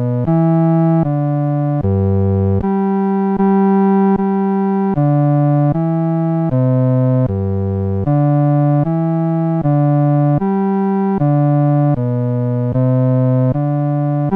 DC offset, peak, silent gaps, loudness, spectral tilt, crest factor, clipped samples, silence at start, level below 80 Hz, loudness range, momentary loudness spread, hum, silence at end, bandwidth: under 0.1%; -6 dBFS; none; -15 LUFS; -12.5 dB/octave; 8 dB; under 0.1%; 0 s; -44 dBFS; 1 LU; 4 LU; none; 0 s; 3.4 kHz